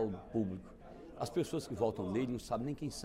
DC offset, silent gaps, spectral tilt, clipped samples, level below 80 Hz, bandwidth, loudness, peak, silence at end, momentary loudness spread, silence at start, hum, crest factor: under 0.1%; none; -6.5 dB/octave; under 0.1%; -60 dBFS; 16 kHz; -38 LUFS; -20 dBFS; 0 s; 14 LU; 0 s; none; 18 dB